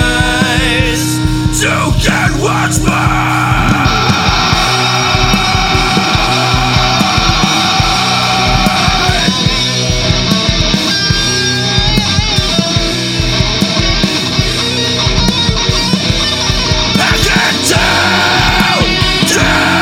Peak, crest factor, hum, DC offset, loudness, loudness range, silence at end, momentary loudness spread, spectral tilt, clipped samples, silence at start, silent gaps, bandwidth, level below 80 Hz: 0 dBFS; 10 dB; none; under 0.1%; -10 LUFS; 2 LU; 0 s; 3 LU; -3.5 dB/octave; under 0.1%; 0 s; none; 17 kHz; -22 dBFS